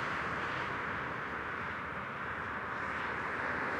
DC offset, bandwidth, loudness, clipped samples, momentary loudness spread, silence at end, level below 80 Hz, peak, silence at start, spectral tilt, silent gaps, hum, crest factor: under 0.1%; 16 kHz; -37 LUFS; under 0.1%; 3 LU; 0 s; -60 dBFS; -24 dBFS; 0 s; -5 dB/octave; none; none; 14 dB